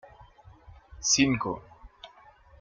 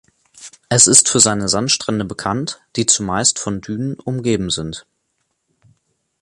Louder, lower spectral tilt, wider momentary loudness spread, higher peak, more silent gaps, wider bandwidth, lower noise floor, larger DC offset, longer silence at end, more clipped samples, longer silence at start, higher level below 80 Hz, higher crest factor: second, -25 LUFS vs -15 LUFS; about the same, -2.5 dB/octave vs -2.5 dB/octave; first, 27 LU vs 15 LU; second, -10 dBFS vs 0 dBFS; neither; second, 10 kHz vs 16 kHz; second, -55 dBFS vs -70 dBFS; neither; second, 0.55 s vs 1.4 s; neither; first, 0.9 s vs 0.35 s; second, -54 dBFS vs -48 dBFS; about the same, 22 dB vs 18 dB